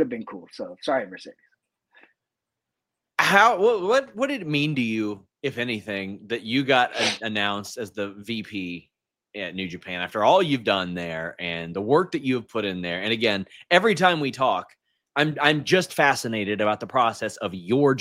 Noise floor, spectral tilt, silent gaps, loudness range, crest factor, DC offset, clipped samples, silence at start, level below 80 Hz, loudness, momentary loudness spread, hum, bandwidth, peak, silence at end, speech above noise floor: -85 dBFS; -4.5 dB/octave; none; 4 LU; 22 dB; under 0.1%; under 0.1%; 0 s; -66 dBFS; -23 LUFS; 13 LU; none; 16.5 kHz; -2 dBFS; 0 s; 62 dB